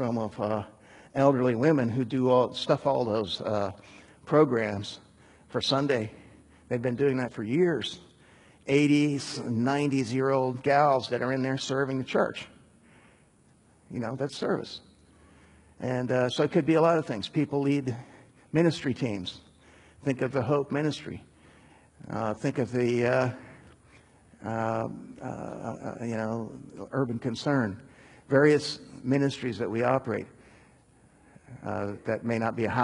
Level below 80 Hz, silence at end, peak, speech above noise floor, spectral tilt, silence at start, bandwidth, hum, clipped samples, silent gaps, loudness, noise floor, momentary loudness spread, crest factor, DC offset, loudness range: -64 dBFS; 0 s; -8 dBFS; 34 dB; -6.5 dB/octave; 0 s; 11 kHz; none; under 0.1%; none; -28 LUFS; -61 dBFS; 15 LU; 20 dB; under 0.1%; 7 LU